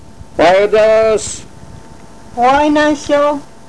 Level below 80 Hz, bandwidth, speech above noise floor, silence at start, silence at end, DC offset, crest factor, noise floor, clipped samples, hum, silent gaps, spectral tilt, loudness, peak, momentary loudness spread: -40 dBFS; 11 kHz; 26 dB; 0.2 s; 0.25 s; 2%; 10 dB; -37 dBFS; under 0.1%; none; none; -4 dB/octave; -11 LUFS; -4 dBFS; 15 LU